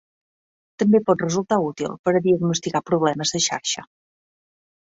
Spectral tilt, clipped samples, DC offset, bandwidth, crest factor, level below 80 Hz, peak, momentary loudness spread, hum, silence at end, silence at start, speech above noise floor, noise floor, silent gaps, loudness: -4.5 dB/octave; under 0.1%; under 0.1%; 8 kHz; 18 dB; -62 dBFS; -6 dBFS; 7 LU; none; 1 s; 0.8 s; over 69 dB; under -90 dBFS; 1.99-2.04 s; -21 LUFS